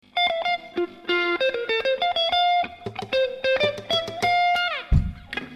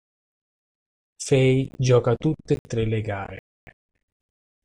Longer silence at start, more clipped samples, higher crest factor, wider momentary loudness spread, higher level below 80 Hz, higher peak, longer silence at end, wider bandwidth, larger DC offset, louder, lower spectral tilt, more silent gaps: second, 0.15 s vs 1.2 s; neither; about the same, 16 dB vs 18 dB; second, 9 LU vs 15 LU; first, -34 dBFS vs -50 dBFS; about the same, -8 dBFS vs -6 dBFS; second, 0 s vs 0.95 s; first, 13.5 kHz vs 11 kHz; neither; about the same, -23 LUFS vs -23 LUFS; second, -5 dB/octave vs -6.5 dB/octave; second, none vs 2.59-2.65 s, 3.39-3.67 s